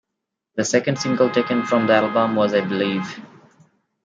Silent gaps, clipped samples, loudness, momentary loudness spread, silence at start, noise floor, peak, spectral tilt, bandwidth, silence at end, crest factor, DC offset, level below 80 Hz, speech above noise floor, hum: none; under 0.1%; -19 LUFS; 10 LU; 0.55 s; -81 dBFS; -4 dBFS; -5 dB/octave; 9.4 kHz; 0.8 s; 18 dB; under 0.1%; -68 dBFS; 62 dB; none